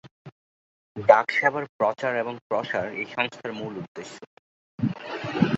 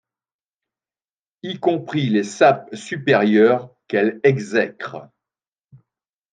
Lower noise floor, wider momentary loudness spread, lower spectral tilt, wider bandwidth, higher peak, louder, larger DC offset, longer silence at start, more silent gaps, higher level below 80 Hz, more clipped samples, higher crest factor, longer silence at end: about the same, under -90 dBFS vs under -90 dBFS; about the same, 19 LU vs 17 LU; about the same, -6.5 dB/octave vs -6 dB/octave; second, 8 kHz vs 9.4 kHz; about the same, 0 dBFS vs -2 dBFS; second, -25 LUFS vs -18 LUFS; neither; second, 0.05 s vs 1.45 s; first, 0.11-0.25 s, 0.32-0.95 s, 1.69-1.79 s, 2.42-2.50 s, 3.88-3.95 s, 4.27-4.78 s vs none; first, -64 dBFS vs -72 dBFS; neither; first, 26 dB vs 18 dB; second, 0 s vs 1.3 s